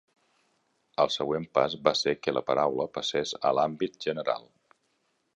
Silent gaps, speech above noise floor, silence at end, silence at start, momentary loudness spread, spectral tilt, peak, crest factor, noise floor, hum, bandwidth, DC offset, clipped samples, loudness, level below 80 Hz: none; 46 dB; 0.95 s; 1 s; 6 LU; -4 dB/octave; -6 dBFS; 24 dB; -74 dBFS; none; 10.5 kHz; under 0.1%; under 0.1%; -28 LUFS; -68 dBFS